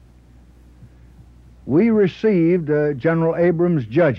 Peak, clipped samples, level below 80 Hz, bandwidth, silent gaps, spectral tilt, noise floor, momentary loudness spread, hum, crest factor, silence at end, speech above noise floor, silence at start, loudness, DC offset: -6 dBFS; under 0.1%; -50 dBFS; 6.2 kHz; none; -10 dB/octave; -47 dBFS; 3 LU; none; 12 dB; 0 s; 31 dB; 0.8 s; -18 LUFS; under 0.1%